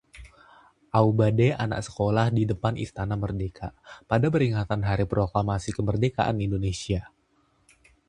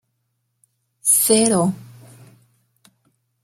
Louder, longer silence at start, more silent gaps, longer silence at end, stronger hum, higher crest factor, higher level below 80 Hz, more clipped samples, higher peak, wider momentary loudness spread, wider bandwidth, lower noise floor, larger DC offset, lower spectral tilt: second, -26 LUFS vs -16 LUFS; second, 0.15 s vs 1.05 s; neither; second, 1 s vs 1.6 s; neither; about the same, 20 dB vs 22 dB; first, -44 dBFS vs -66 dBFS; neither; second, -6 dBFS vs -2 dBFS; about the same, 9 LU vs 10 LU; second, 10 kHz vs 16.5 kHz; second, -66 dBFS vs -72 dBFS; neither; first, -7 dB/octave vs -3.5 dB/octave